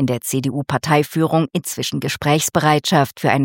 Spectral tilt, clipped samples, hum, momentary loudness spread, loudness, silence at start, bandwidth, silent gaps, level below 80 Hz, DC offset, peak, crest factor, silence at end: -5 dB/octave; under 0.1%; none; 6 LU; -18 LUFS; 0 s; 17 kHz; none; -54 dBFS; under 0.1%; 0 dBFS; 18 dB; 0 s